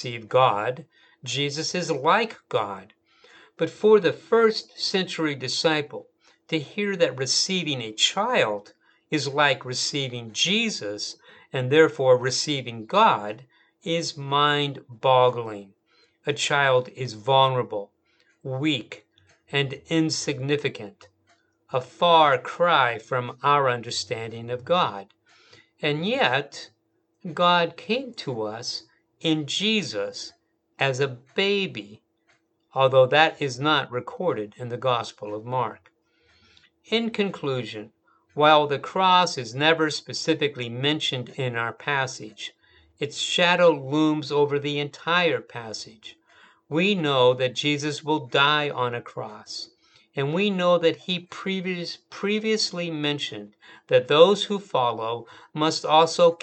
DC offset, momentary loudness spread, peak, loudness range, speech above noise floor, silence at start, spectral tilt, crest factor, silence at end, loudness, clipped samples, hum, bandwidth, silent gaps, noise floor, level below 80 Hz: under 0.1%; 15 LU; -2 dBFS; 5 LU; 47 dB; 0 s; -4 dB/octave; 24 dB; 0.05 s; -23 LUFS; under 0.1%; none; 9 kHz; none; -71 dBFS; -74 dBFS